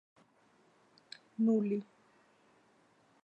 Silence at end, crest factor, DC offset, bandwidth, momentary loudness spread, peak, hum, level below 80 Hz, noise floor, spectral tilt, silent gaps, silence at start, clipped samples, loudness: 1.4 s; 16 dB; under 0.1%; 8.4 kHz; 23 LU; -22 dBFS; none; under -90 dBFS; -69 dBFS; -8.5 dB/octave; none; 1.4 s; under 0.1%; -33 LUFS